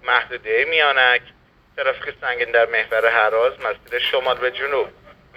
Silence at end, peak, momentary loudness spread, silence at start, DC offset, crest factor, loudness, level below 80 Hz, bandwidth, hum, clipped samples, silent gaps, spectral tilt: 0.45 s; 0 dBFS; 9 LU; 0.05 s; under 0.1%; 20 dB; -19 LUFS; -56 dBFS; 14.5 kHz; none; under 0.1%; none; -3.5 dB/octave